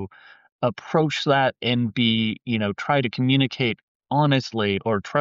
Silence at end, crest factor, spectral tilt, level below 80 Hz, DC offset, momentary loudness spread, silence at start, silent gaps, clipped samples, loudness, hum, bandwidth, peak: 0 s; 14 dB; -4 dB/octave; -60 dBFS; under 0.1%; 6 LU; 0 s; 0.52-0.59 s, 3.83-4.00 s; under 0.1%; -22 LUFS; none; 7.8 kHz; -8 dBFS